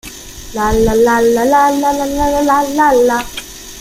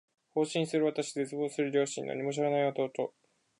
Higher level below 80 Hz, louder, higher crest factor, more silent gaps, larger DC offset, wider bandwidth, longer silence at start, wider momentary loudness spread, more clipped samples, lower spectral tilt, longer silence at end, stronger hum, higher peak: first, -30 dBFS vs -84 dBFS; first, -12 LUFS vs -32 LUFS; about the same, 12 dB vs 16 dB; neither; neither; first, 16 kHz vs 11.5 kHz; second, 0.05 s vs 0.35 s; first, 16 LU vs 6 LU; neither; about the same, -4.5 dB/octave vs -5 dB/octave; second, 0 s vs 0.5 s; neither; first, -2 dBFS vs -16 dBFS